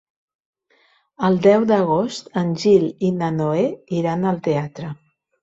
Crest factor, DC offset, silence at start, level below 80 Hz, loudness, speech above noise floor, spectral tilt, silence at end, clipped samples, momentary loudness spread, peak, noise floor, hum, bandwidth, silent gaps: 18 dB; under 0.1%; 1.2 s; -58 dBFS; -19 LUFS; 41 dB; -7 dB/octave; 0.5 s; under 0.1%; 10 LU; -2 dBFS; -60 dBFS; none; 8 kHz; none